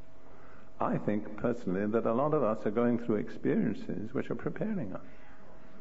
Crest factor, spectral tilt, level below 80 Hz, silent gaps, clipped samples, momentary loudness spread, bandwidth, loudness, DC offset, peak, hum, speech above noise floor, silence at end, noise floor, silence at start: 16 dB; -9 dB/octave; -62 dBFS; none; under 0.1%; 8 LU; 7.8 kHz; -32 LUFS; 1%; -16 dBFS; none; 24 dB; 0 s; -55 dBFS; 0.15 s